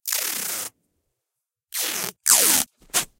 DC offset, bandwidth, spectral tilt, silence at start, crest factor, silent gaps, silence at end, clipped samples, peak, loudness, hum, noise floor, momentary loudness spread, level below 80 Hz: under 0.1%; 17 kHz; 1 dB/octave; 0.05 s; 24 dB; none; 0.15 s; under 0.1%; -2 dBFS; -20 LUFS; none; -84 dBFS; 15 LU; -62 dBFS